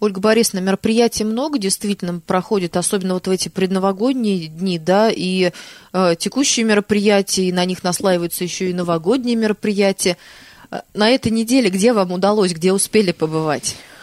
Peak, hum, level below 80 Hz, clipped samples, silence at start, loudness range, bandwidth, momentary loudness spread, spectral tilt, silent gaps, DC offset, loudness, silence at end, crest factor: -2 dBFS; none; -54 dBFS; under 0.1%; 0 s; 2 LU; 15 kHz; 6 LU; -4.5 dB/octave; none; under 0.1%; -17 LUFS; 0.05 s; 14 dB